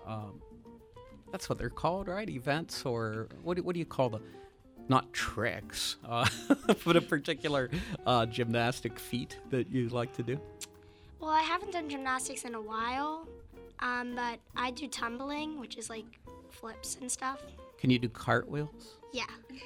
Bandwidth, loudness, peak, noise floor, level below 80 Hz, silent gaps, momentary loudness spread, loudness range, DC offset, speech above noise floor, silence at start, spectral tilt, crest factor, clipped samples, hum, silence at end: 20 kHz; -34 LUFS; -12 dBFS; -55 dBFS; -56 dBFS; none; 18 LU; 7 LU; under 0.1%; 22 dB; 0 s; -4.5 dB/octave; 24 dB; under 0.1%; none; 0 s